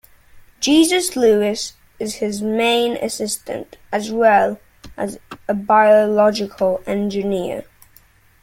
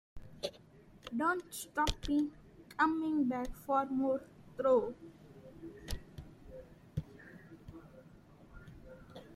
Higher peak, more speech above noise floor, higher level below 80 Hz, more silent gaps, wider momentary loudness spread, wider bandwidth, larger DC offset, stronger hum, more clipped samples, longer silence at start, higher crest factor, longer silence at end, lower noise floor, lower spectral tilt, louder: first, -2 dBFS vs -14 dBFS; first, 34 dB vs 26 dB; about the same, -52 dBFS vs -54 dBFS; neither; second, 15 LU vs 23 LU; about the same, 16.5 kHz vs 16 kHz; neither; neither; neither; first, 0.35 s vs 0.15 s; second, 16 dB vs 24 dB; first, 0.8 s vs 0 s; second, -51 dBFS vs -59 dBFS; second, -3.5 dB/octave vs -5 dB/octave; first, -18 LUFS vs -36 LUFS